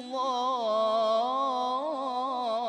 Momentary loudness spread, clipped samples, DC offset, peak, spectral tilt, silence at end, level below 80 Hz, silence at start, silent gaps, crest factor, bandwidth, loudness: 5 LU; under 0.1%; under 0.1%; -18 dBFS; -3.5 dB/octave; 0 s; -80 dBFS; 0 s; none; 10 dB; 10 kHz; -28 LUFS